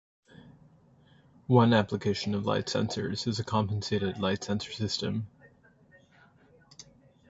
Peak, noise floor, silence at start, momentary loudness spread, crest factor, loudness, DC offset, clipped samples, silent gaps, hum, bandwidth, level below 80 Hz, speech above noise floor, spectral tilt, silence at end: -8 dBFS; -60 dBFS; 0.4 s; 18 LU; 24 dB; -29 LUFS; under 0.1%; under 0.1%; none; none; 8 kHz; -56 dBFS; 32 dB; -6 dB/octave; 0.5 s